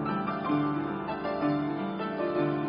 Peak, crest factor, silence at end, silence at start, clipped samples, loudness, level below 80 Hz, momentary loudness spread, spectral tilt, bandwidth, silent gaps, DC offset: -16 dBFS; 14 dB; 0 s; 0 s; under 0.1%; -30 LUFS; -60 dBFS; 4 LU; -6 dB/octave; 5.4 kHz; none; under 0.1%